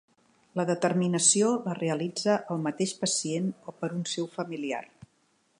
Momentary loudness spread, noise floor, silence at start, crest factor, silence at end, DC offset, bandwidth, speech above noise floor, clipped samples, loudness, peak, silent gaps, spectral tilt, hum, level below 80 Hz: 13 LU; -69 dBFS; 0.55 s; 20 dB; 0.75 s; under 0.1%; 11.5 kHz; 41 dB; under 0.1%; -28 LUFS; -10 dBFS; none; -4 dB/octave; none; -76 dBFS